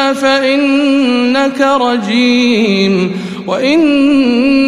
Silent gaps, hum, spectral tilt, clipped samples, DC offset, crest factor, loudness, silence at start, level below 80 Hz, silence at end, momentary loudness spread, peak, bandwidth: none; none; -5 dB/octave; under 0.1%; 0.4%; 10 dB; -11 LUFS; 0 s; -50 dBFS; 0 s; 5 LU; 0 dBFS; 11.5 kHz